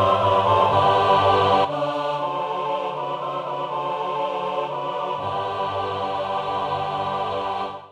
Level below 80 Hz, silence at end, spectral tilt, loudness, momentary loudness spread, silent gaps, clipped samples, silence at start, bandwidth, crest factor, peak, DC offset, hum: -58 dBFS; 0 s; -6 dB/octave; -22 LUFS; 10 LU; none; under 0.1%; 0 s; 11 kHz; 16 dB; -6 dBFS; under 0.1%; none